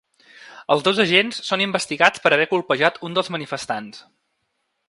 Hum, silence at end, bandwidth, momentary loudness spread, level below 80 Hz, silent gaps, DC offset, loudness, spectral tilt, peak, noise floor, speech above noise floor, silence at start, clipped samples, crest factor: none; 0.9 s; 11.5 kHz; 12 LU; -68 dBFS; none; under 0.1%; -19 LUFS; -3.5 dB/octave; 0 dBFS; -73 dBFS; 53 dB; 0.4 s; under 0.1%; 22 dB